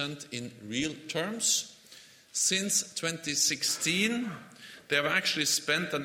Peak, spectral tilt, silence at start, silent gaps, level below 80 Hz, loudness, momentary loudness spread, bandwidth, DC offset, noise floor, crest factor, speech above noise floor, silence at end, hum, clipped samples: -12 dBFS; -1.5 dB/octave; 0 s; none; -70 dBFS; -28 LUFS; 13 LU; 16.5 kHz; under 0.1%; -54 dBFS; 20 dB; 24 dB; 0 s; none; under 0.1%